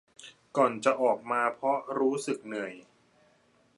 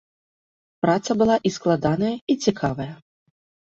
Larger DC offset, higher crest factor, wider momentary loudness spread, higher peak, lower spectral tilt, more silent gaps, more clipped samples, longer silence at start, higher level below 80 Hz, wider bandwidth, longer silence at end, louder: neither; about the same, 20 dB vs 18 dB; first, 13 LU vs 7 LU; second, -10 dBFS vs -6 dBFS; second, -4.5 dB/octave vs -6 dB/octave; second, none vs 2.21-2.27 s; neither; second, 0.2 s vs 0.85 s; second, -82 dBFS vs -54 dBFS; first, 11.5 kHz vs 8 kHz; first, 1 s vs 0.75 s; second, -29 LUFS vs -22 LUFS